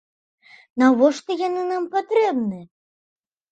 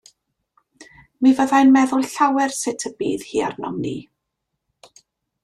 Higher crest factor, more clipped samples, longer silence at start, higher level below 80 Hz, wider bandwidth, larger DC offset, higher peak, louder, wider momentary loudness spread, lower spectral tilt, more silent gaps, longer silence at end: about the same, 20 dB vs 16 dB; neither; about the same, 0.75 s vs 0.8 s; second, -72 dBFS vs -62 dBFS; second, 8.8 kHz vs 13 kHz; neither; about the same, -2 dBFS vs -4 dBFS; about the same, -20 LUFS vs -19 LUFS; about the same, 13 LU vs 13 LU; first, -5.5 dB/octave vs -4 dB/octave; neither; second, 0.85 s vs 1.4 s